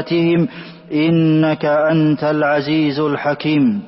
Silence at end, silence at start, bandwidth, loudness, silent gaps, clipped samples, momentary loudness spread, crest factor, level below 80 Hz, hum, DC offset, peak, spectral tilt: 0 s; 0 s; 5.8 kHz; -16 LUFS; none; under 0.1%; 5 LU; 10 dB; -56 dBFS; none; under 0.1%; -6 dBFS; -11.5 dB/octave